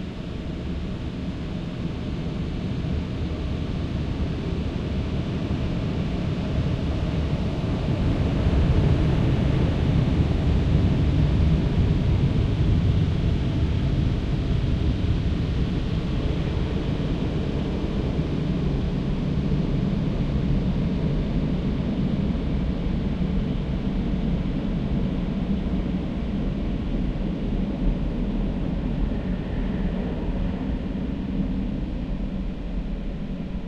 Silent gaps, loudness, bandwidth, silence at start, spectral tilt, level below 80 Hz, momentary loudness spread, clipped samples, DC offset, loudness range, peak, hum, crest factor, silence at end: none; -25 LUFS; 8.2 kHz; 0 s; -8.5 dB/octave; -28 dBFS; 8 LU; under 0.1%; under 0.1%; 6 LU; -8 dBFS; none; 16 dB; 0 s